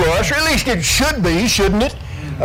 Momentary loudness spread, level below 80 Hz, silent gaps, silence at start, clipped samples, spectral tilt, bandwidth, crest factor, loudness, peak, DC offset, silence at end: 7 LU; -26 dBFS; none; 0 s; under 0.1%; -3.5 dB/octave; 18.5 kHz; 12 dB; -15 LUFS; -4 dBFS; under 0.1%; 0 s